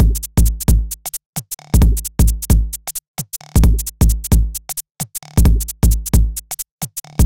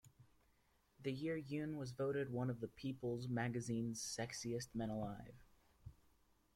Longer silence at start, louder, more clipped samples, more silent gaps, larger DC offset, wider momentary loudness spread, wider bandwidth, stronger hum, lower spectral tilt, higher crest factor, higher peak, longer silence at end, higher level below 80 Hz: about the same, 0 s vs 0.05 s; first, -18 LUFS vs -44 LUFS; neither; first, 1.26-1.33 s, 3.08-3.14 s, 4.91-4.95 s, 6.72-6.78 s vs none; first, 1% vs under 0.1%; second, 11 LU vs 14 LU; about the same, 17.5 kHz vs 16 kHz; neither; about the same, -5.5 dB/octave vs -5.5 dB/octave; about the same, 16 dB vs 16 dB; first, 0 dBFS vs -30 dBFS; second, 0 s vs 0.65 s; first, -16 dBFS vs -70 dBFS